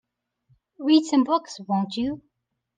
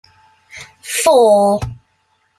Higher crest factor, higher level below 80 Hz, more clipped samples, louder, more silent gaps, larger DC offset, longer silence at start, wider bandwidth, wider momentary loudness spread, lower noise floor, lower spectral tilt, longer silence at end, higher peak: about the same, 18 dB vs 14 dB; second, -64 dBFS vs -44 dBFS; neither; second, -23 LUFS vs -13 LUFS; neither; neither; first, 0.8 s vs 0.55 s; second, 9.2 kHz vs 16 kHz; second, 11 LU vs 24 LU; first, -67 dBFS vs -62 dBFS; first, -5.5 dB/octave vs -4 dB/octave; about the same, 0.6 s vs 0.65 s; second, -8 dBFS vs -2 dBFS